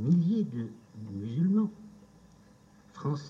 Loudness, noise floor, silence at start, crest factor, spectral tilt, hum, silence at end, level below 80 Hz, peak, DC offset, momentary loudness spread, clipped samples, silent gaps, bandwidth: -31 LUFS; -58 dBFS; 0 s; 16 dB; -9.5 dB/octave; none; 0 s; -70 dBFS; -16 dBFS; under 0.1%; 16 LU; under 0.1%; none; 7.2 kHz